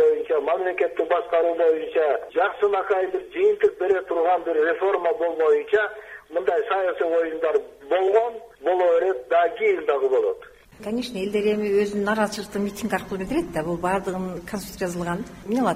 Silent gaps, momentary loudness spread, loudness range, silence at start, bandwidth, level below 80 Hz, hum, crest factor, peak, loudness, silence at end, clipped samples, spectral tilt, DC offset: none; 9 LU; 3 LU; 0 s; 15.5 kHz; -54 dBFS; none; 16 dB; -6 dBFS; -23 LUFS; 0 s; under 0.1%; -5.5 dB/octave; under 0.1%